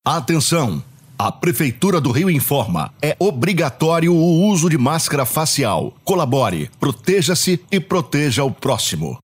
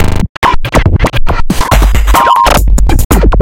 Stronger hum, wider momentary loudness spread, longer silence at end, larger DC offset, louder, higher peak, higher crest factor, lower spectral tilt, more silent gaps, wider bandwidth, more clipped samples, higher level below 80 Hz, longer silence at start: neither; about the same, 6 LU vs 7 LU; about the same, 0.1 s vs 0 s; neither; second, -17 LUFS vs -9 LUFS; about the same, -2 dBFS vs 0 dBFS; first, 16 dB vs 6 dB; about the same, -5 dB/octave vs -5 dB/octave; second, none vs 0.29-0.42 s, 3.05-3.10 s; about the same, 16 kHz vs 17 kHz; second, under 0.1% vs 4%; second, -54 dBFS vs -10 dBFS; about the same, 0.05 s vs 0 s